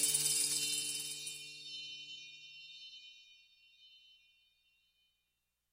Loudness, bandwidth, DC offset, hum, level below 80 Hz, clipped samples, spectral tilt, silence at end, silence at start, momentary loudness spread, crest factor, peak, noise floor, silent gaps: -36 LUFS; 16 kHz; under 0.1%; 60 Hz at -95 dBFS; -86 dBFS; under 0.1%; 1 dB/octave; 1.6 s; 0 s; 21 LU; 26 dB; -18 dBFS; -85 dBFS; none